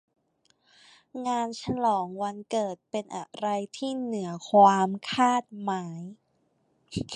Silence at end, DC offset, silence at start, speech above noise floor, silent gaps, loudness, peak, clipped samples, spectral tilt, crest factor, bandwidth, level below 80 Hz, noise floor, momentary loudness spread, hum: 0 s; under 0.1%; 1.15 s; 44 dB; none; -27 LUFS; -8 dBFS; under 0.1%; -5 dB/octave; 22 dB; 11 kHz; -62 dBFS; -71 dBFS; 18 LU; none